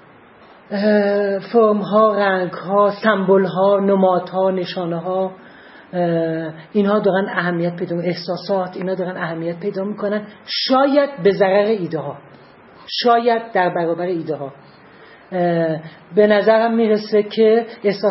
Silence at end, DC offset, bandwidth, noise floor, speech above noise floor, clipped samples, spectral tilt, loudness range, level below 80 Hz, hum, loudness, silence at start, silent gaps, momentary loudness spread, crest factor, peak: 0 s; under 0.1%; 6 kHz; -46 dBFS; 28 dB; under 0.1%; -9 dB/octave; 5 LU; -68 dBFS; none; -18 LUFS; 0.7 s; none; 10 LU; 18 dB; 0 dBFS